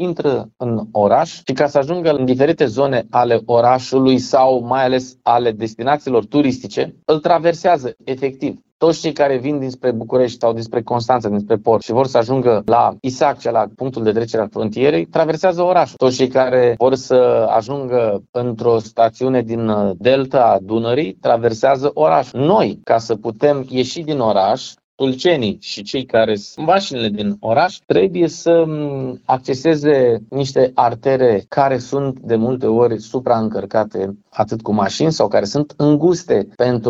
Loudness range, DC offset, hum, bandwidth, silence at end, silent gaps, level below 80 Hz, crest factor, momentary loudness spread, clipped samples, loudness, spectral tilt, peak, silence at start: 3 LU; under 0.1%; none; 7.8 kHz; 0 s; 8.72-8.80 s, 18.29-18.33 s, 24.84-24.98 s; -54 dBFS; 16 dB; 7 LU; under 0.1%; -16 LUFS; -6 dB/octave; 0 dBFS; 0 s